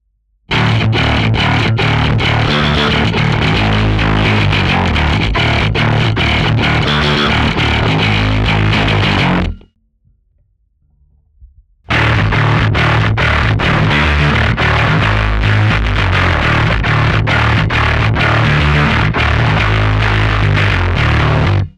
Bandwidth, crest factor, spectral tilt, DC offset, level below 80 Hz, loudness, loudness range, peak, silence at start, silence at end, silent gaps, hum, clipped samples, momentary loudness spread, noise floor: 9.2 kHz; 12 dB; -6 dB/octave; under 0.1%; -22 dBFS; -12 LUFS; 4 LU; 0 dBFS; 0.5 s; 0.1 s; none; none; under 0.1%; 2 LU; -57 dBFS